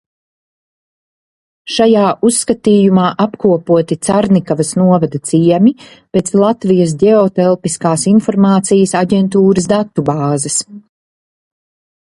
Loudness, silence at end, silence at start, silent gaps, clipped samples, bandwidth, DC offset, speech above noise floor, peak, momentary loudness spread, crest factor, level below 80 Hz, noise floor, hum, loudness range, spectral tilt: -12 LUFS; 1.3 s; 1.65 s; none; under 0.1%; 11.5 kHz; under 0.1%; over 79 dB; 0 dBFS; 5 LU; 12 dB; -50 dBFS; under -90 dBFS; none; 2 LU; -6 dB/octave